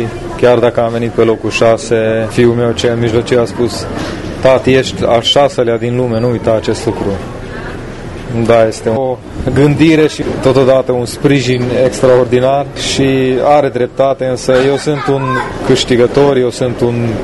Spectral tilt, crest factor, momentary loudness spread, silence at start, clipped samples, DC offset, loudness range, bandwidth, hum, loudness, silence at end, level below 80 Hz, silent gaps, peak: -5.5 dB/octave; 12 dB; 10 LU; 0 s; 0.3%; under 0.1%; 4 LU; 12 kHz; none; -11 LUFS; 0 s; -34 dBFS; none; 0 dBFS